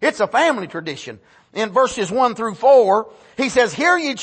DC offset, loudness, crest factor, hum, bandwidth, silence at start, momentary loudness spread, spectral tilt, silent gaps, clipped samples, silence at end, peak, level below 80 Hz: under 0.1%; -17 LUFS; 16 dB; none; 8.8 kHz; 0 s; 17 LU; -3.5 dB/octave; none; under 0.1%; 0 s; -2 dBFS; -58 dBFS